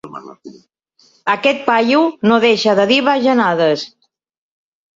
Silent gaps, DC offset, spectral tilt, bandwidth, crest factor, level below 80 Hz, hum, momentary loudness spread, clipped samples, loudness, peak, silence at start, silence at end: none; under 0.1%; -5 dB/octave; 7.8 kHz; 16 dB; -62 dBFS; none; 12 LU; under 0.1%; -14 LUFS; 0 dBFS; 0.05 s; 1.1 s